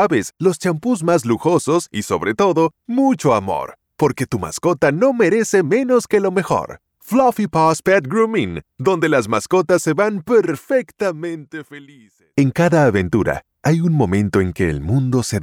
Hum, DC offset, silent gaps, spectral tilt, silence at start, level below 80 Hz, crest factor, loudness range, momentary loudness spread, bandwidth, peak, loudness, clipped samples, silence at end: none; under 0.1%; none; -6 dB/octave; 0 s; -46 dBFS; 12 dB; 2 LU; 7 LU; 17.5 kHz; -4 dBFS; -17 LUFS; under 0.1%; 0 s